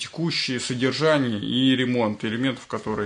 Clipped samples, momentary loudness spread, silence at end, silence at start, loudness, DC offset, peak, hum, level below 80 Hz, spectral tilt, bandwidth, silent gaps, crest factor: under 0.1%; 6 LU; 0 s; 0 s; -23 LUFS; under 0.1%; -6 dBFS; none; -60 dBFS; -5 dB/octave; 10.5 kHz; none; 16 dB